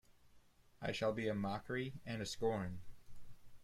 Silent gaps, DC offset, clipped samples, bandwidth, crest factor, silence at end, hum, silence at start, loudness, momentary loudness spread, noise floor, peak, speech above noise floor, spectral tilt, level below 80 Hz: none; under 0.1%; under 0.1%; 15.5 kHz; 18 dB; 0 s; none; 0.1 s; -42 LUFS; 8 LU; -67 dBFS; -24 dBFS; 26 dB; -5.5 dB/octave; -64 dBFS